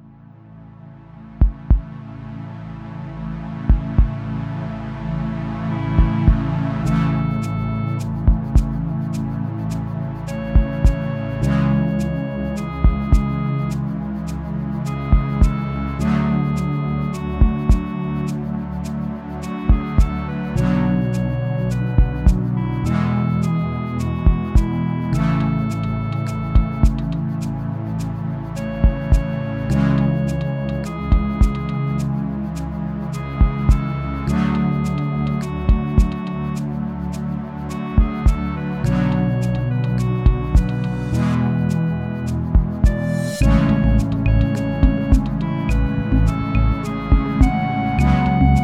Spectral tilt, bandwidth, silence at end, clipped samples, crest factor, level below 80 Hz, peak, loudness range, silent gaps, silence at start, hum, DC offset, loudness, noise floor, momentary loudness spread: -8 dB/octave; 11.5 kHz; 0 s; under 0.1%; 16 dB; -22 dBFS; -2 dBFS; 4 LU; none; 0.05 s; none; under 0.1%; -20 LUFS; -43 dBFS; 8 LU